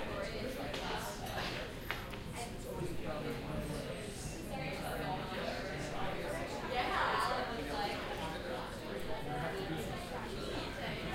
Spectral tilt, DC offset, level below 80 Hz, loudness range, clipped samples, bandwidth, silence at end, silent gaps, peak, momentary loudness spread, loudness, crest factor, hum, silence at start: -4.5 dB/octave; under 0.1%; -50 dBFS; 4 LU; under 0.1%; 16 kHz; 0 s; none; -16 dBFS; 7 LU; -40 LUFS; 24 dB; none; 0 s